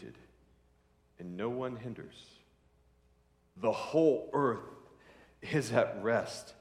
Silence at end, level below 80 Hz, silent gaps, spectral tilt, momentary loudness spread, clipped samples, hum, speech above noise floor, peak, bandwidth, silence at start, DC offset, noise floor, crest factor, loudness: 0.05 s; -70 dBFS; none; -6 dB/octave; 21 LU; under 0.1%; none; 36 dB; -14 dBFS; 13.5 kHz; 0 s; under 0.1%; -69 dBFS; 22 dB; -33 LUFS